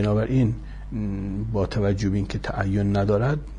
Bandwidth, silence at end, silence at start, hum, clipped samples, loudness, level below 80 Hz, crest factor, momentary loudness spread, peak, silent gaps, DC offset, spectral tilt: 9.6 kHz; 0 s; 0 s; none; under 0.1%; -25 LUFS; -36 dBFS; 14 dB; 8 LU; -10 dBFS; none; under 0.1%; -8 dB/octave